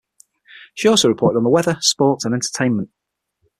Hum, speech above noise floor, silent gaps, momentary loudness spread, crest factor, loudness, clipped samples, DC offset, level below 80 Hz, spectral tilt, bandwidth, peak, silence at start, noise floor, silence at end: none; 54 dB; none; 9 LU; 18 dB; -17 LUFS; under 0.1%; under 0.1%; -56 dBFS; -4 dB/octave; 14.5 kHz; -2 dBFS; 0.55 s; -71 dBFS; 0.75 s